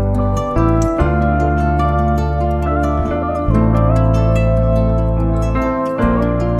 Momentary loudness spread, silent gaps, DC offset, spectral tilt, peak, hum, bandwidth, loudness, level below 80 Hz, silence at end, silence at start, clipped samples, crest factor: 4 LU; none; under 0.1%; -9 dB/octave; -2 dBFS; none; 8.4 kHz; -16 LUFS; -20 dBFS; 0 s; 0 s; under 0.1%; 12 dB